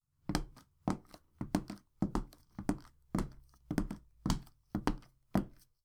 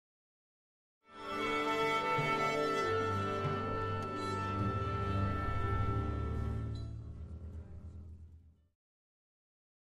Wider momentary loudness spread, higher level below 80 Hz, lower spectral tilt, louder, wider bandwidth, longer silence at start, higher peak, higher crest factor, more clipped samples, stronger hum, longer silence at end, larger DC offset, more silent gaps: second, 10 LU vs 16 LU; about the same, -48 dBFS vs -48 dBFS; about the same, -6 dB/octave vs -6 dB/octave; second, -40 LUFS vs -35 LUFS; first, 17.5 kHz vs 13.5 kHz; second, 0.25 s vs 1.1 s; first, -12 dBFS vs -22 dBFS; first, 28 dB vs 16 dB; neither; neither; second, 0.35 s vs 1.4 s; neither; neither